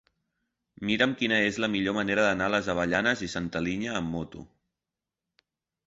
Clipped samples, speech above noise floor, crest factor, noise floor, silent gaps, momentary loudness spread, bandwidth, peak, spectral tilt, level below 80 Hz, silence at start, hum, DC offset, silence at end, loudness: under 0.1%; 61 dB; 20 dB; -89 dBFS; none; 10 LU; 8 kHz; -8 dBFS; -4.5 dB/octave; -56 dBFS; 0.8 s; none; under 0.1%; 1.4 s; -27 LUFS